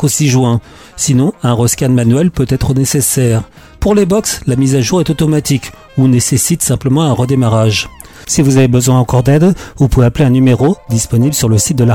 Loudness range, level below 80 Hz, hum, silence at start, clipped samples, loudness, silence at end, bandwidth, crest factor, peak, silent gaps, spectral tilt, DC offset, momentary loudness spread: 2 LU; -30 dBFS; none; 0 s; under 0.1%; -11 LUFS; 0 s; 17 kHz; 10 dB; -2 dBFS; none; -5.5 dB/octave; under 0.1%; 6 LU